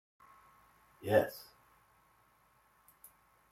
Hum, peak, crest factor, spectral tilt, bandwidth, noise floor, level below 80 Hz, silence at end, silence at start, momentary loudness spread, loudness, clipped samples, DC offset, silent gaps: none; -14 dBFS; 26 dB; -6 dB/octave; 16.5 kHz; -70 dBFS; -76 dBFS; 2.1 s; 1 s; 28 LU; -33 LUFS; under 0.1%; under 0.1%; none